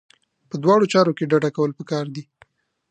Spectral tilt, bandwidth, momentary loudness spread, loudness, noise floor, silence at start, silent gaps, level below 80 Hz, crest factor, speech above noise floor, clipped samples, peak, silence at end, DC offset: -6.5 dB/octave; 9.2 kHz; 16 LU; -20 LUFS; -57 dBFS; 0.55 s; none; -70 dBFS; 18 dB; 38 dB; under 0.1%; -2 dBFS; 0.7 s; under 0.1%